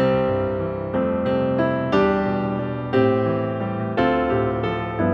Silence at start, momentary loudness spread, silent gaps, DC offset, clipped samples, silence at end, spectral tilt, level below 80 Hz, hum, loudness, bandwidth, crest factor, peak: 0 s; 6 LU; none; under 0.1%; under 0.1%; 0 s; -9 dB/octave; -44 dBFS; none; -22 LUFS; 6.6 kHz; 16 dB; -6 dBFS